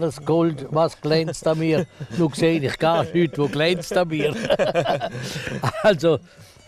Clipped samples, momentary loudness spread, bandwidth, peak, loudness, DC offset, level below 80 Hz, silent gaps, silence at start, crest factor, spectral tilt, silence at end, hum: under 0.1%; 6 LU; 14.5 kHz; -8 dBFS; -21 LUFS; under 0.1%; -52 dBFS; none; 0 s; 14 dB; -6 dB/octave; 0.25 s; none